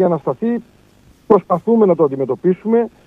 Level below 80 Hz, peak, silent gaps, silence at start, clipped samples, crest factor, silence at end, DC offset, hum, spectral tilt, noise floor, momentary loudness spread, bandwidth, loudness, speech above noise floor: -56 dBFS; 0 dBFS; none; 0 s; under 0.1%; 16 dB; 0.2 s; under 0.1%; none; -10.5 dB/octave; -49 dBFS; 7 LU; 4 kHz; -16 LUFS; 34 dB